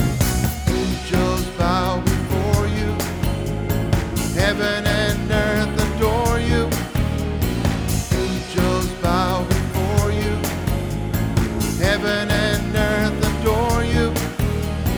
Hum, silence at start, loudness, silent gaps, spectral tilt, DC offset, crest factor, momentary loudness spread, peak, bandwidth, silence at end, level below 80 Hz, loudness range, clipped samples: none; 0 s; -20 LUFS; none; -5.5 dB/octave; under 0.1%; 16 dB; 4 LU; -2 dBFS; over 20 kHz; 0 s; -28 dBFS; 1 LU; under 0.1%